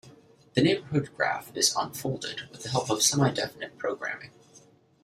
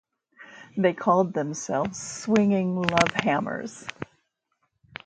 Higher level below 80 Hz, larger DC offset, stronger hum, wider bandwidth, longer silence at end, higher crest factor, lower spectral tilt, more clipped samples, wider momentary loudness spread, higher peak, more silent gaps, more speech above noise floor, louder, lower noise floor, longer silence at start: about the same, -64 dBFS vs -60 dBFS; neither; neither; first, 16 kHz vs 9.2 kHz; second, 0.45 s vs 1 s; about the same, 22 dB vs 26 dB; second, -3.5 dB/octave vs -5 dB/octave; neither; second, 12 LU vs 17 LU; second, -8 dBFS vs 0 dBFS; neither; second, 29 dB vs 51 dB; about the same, -27 LUFS vs -25 LUFS; second, -57 dBFS vs -75 dBFS; second, 0.05 s vs 0.4 s